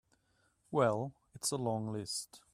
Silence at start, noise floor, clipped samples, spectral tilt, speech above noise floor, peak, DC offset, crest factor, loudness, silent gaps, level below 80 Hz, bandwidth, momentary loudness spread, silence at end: 0.7 s; -75 dBFS; under 0.1%; -4.5 dB/octave; 39 dB; -16 dBFS; under 0.1%; 22 dB; -36 LUFS; none; -74 dBFS; 15 kHz; 8 LU; 0.15 s